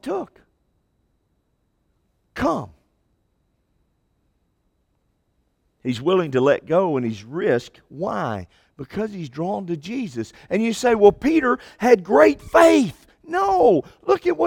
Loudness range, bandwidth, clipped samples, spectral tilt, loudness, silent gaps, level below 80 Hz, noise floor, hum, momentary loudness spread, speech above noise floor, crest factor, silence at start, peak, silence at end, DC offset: 15 LU; 17 kHz; under 0.1%; -6 dB/octave; -20 LUFS; none; -52 dBFS; -69 dBFS; none; 15 LU; 49 dB; 22 dB; 0.05 s; 0 dBFS; 0 s; under 0.1%